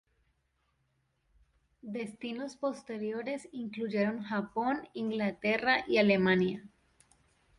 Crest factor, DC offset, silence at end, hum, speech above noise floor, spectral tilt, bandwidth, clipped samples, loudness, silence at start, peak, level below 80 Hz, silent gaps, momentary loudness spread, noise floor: 20 dB; under 0.1%; 0.9 s; none; 45 dB; -6.5 dB/octave; 11 kHz; under 0.1%; -32 LUFS; 1.85 s; -12 dBFS; -68 dBFS; none; 14 LU; -77 dBFS